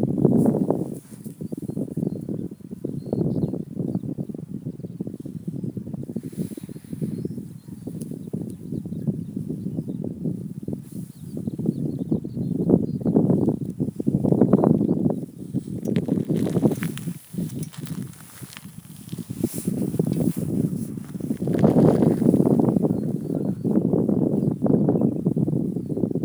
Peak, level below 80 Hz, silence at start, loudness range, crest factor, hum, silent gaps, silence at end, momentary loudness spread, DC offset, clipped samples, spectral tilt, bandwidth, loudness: -2 dBFS; -54 dBFS; 0 s; 11 LU; 22 dB; none; none; 0 s; 15 LU; under 0.1%; under 0.1%; -9 dB/octave; over 20 kHz; -24 LUFS